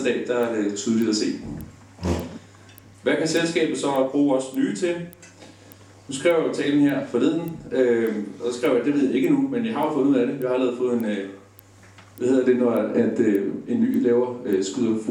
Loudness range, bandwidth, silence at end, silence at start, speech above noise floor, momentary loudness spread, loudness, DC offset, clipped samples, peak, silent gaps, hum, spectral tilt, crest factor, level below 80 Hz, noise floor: 3 LU; 18 kHz; 0 s; 0 s; 27 dB; 9 LU; -23 LUFS; under 0.1%; under 0.1%; -6 dBFS; none; none; -5.5 dB/octave; 16 dB; -52 dBFS; -49 dBFS